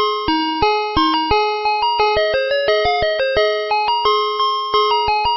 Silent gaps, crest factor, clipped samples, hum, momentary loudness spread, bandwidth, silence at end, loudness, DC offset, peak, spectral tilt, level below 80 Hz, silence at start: none; 14 dB; under 0.1%; none; 2 LU; 6 kHz; 0 s; -16 LUFS; under 0.1%; -2 dBFS; -0.5 dB/octave; -38 dBFS; 0 s